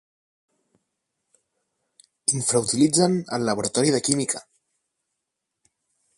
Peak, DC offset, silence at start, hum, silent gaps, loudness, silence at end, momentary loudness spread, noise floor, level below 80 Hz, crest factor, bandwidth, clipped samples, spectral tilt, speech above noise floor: -2 dBFS; under 0.1%; 2.3 s; none; none; -22 LUFS; 1.75 s; 7 LU; -82 dBFS; -64 dBFS; 24 dB; 11.5 kHz; under 0.1%; -4 dB/octave; 60 dB